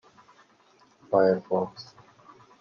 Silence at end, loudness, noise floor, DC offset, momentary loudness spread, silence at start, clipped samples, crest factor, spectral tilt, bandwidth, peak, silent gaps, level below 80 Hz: 0.75 s; -26 LUFS; -61 dBFS; under 0.1%; 23 LU; 1.1 s; under 0.1%; 20 dB; -7.5 dB/octave; 6.8 kHz; -8 dBFS; none; -76 dBFS